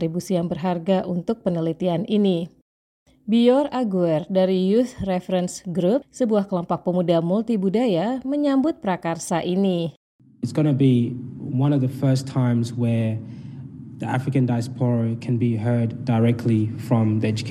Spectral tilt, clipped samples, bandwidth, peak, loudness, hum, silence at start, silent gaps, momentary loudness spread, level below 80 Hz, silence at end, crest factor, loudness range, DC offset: -7.5 dB/octave; under 0.1%; 13.5 kHz; -6 dBFS; -22 LUFS; none; 0 s; 2.62-3.06 s, 9.96-10.19 s; 8 LU; -58 dBFS; 0 s; 16 dB; 3 LU; under 0.1%